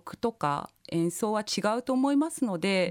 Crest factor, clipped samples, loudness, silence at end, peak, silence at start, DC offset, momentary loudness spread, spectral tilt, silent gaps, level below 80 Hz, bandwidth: 14 dB; under 0.1%; -29 LUFS; 0 s; -14 dBFS; 0.05 s; under 0.1%; 6 LU; -5 dB/octave; none; -68 dBFS; 17 kHz